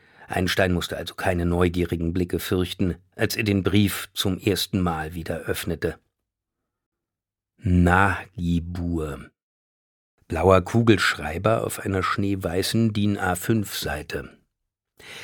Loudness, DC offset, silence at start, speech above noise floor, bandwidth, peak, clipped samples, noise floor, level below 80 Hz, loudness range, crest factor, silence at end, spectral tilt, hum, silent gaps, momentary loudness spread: -24 LUFS; under 0.1%; 0.2 s; 65 dB; 19 kHz; -2 dBFS; under 0.1%; -88 dBFS; -42 dBFS; 4 LU; 22 dB; 0 s; -5.5 dB/octave; none; 6.86-6.92 s, 9.43-10.18 s; 11 LU